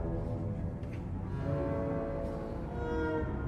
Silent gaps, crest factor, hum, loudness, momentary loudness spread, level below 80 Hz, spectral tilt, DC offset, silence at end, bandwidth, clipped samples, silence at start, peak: none; 12 dB; none; -36 LUFS; 5 LU; -42 dBFS; -9.5 dB/octave; under 0.1%; 0 s; 9 kHz; under 0.1%; 0 s; -22 dBFS